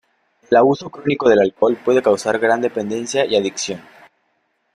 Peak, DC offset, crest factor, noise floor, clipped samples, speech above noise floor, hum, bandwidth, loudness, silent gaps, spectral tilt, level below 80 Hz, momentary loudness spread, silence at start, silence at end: -2 dBFS; under 0.1%; 16 dB; -67 dBFS; under 0.1%; 50 dB; none; 11.5 kHz; -17 LUFS; none; -4.5 dB/octave; -60 dBFS; 9 LU; 0.5 s; 0.95 s